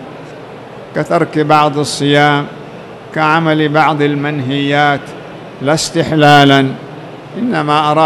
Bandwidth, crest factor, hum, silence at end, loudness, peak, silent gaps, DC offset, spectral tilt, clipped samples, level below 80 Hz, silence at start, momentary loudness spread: 13.5 kHz; 12 dB; none; 0 s; -12 LUFS; 0 dBFS; none; under 0.1%; -5 dB/octave; 0.8%; -50 dBFS; 0 s; 21 LU